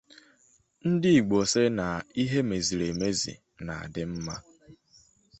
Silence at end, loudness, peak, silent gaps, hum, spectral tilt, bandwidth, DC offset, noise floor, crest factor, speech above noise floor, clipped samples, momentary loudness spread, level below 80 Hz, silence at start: 0.65 s; -27 LUFS; -10 dBFS; none; none; -5 dB/octave; 8.4 kHz; under 0.1%; -65 dBFS; 18 dB; 38 dB; under 0.1%; 15 LU; -54 dBFS; 0.85 s